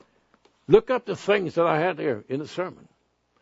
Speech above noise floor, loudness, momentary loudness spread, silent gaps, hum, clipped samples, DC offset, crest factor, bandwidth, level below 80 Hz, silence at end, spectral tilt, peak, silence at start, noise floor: 45 dB; -24 LUFS; 12 LU; none; none; under 0.1%; under 0.1%; 24 dB; 8 kHz; -54 dBFS; 0.7 s; -6.5 dB/octave; -2 dBFS; 0.7 s; -68 dBFS